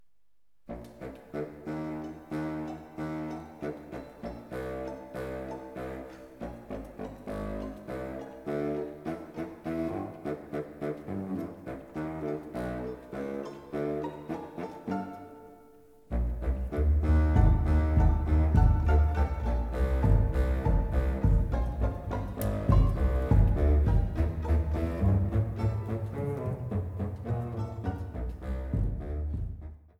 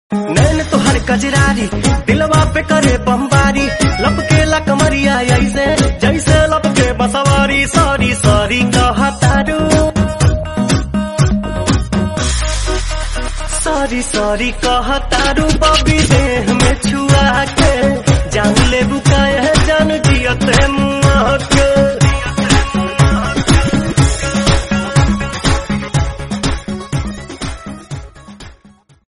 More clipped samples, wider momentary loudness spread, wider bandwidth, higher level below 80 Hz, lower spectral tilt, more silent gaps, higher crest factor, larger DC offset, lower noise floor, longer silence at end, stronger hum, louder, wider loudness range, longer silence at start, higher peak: neither; first, 15 LU vs 7 LU; first, 13.5 kHz vs 11.5 kHz; second, -32 dBFS vs -20 dBFS; first, -9 dB/octave vs -5 dB/octave; neither; first, 18 dB vs 12 dB; neither; first, -81 dBFS vs -46 dBFS; second, 0.2 s vs 0.55 s; neither; second, -31 LUFS vs -13 LUFS; first, 13 LU vs 5 LU; first, 0.7 s vs 0.1 s; second, -10 dBFS vs 0 dBFS